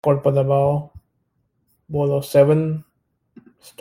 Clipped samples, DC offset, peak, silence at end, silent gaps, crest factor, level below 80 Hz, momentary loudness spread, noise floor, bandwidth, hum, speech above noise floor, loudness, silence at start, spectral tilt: under 0.1%; under 0.1%; -2 dBFS; 1 s; none; 18 dB; -56 dBFS; 11 LU; -69 dBFS; 16 kHz; none; 52 dB; -19 LUFS; 0.05 s; -8.5 dB/octave